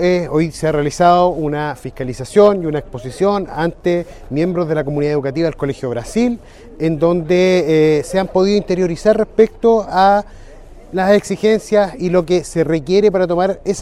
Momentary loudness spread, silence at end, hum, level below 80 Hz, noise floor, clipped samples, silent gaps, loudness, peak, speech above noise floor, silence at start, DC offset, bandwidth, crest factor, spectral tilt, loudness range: 9 LU; 0 s; none; -38 dBFS; -37 dBFS; under 0.1%; none; -16 LUFS; 0 dBFS; 22 dB; 0 s; under 0.1%; 13 kHz; 14 dB; -6.5 dB/octave; 4 LU